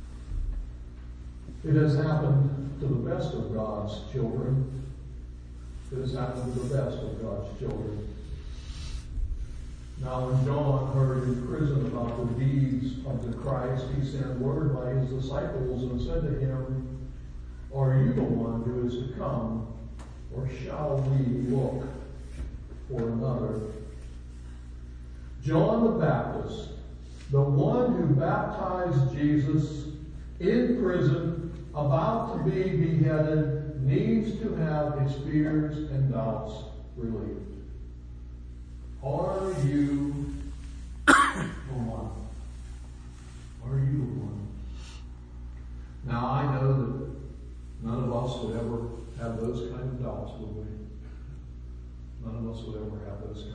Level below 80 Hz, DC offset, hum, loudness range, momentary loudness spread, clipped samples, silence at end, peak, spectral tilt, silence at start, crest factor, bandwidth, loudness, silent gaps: -40 dBFS; under 0.1%; 60 Hz at -40 dBFS; 8 LU; 19 LU; under 0.1%; 0 s; -4 dBFS; -7.5 dB/octave; 0 s; 26 dB; 10.5 kHz; -29 LUFS; none